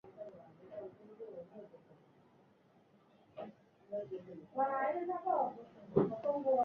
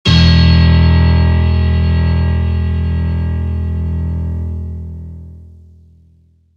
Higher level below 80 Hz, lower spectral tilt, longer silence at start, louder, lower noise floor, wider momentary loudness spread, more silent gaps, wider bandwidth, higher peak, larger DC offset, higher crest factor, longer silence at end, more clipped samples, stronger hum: second, -76 dBFS vs -18 dBFS; about the same, -7.5 dB/octave vs -7.5 dB/octave; about the same, 0.05 s vs 0.05 s; second, -38 LUFS vs -13 LUFS; first, -68 dBFS vs -50 dBFS; about the same, 19 LU vs 17 LU; neither; second, 5.8 kHz vs 6.8 kHz; second, -16 dBFS vs 0 dBFS; neither; first, 24 dB vs 12 dB; second, 0 s vs 1.15 s; neither; neither